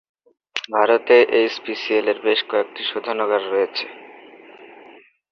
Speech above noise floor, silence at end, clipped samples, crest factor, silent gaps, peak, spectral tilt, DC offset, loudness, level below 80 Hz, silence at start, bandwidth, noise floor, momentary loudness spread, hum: 29 dB; 0.65 s; under 0.1%; 18 dB; none; -2 dBFS; -3.5 dB/octave; under 0.1%; -19 LUFS; -72 dBFS; 0.55 s; 7 kHz; -48 dBFS; 13 LU; none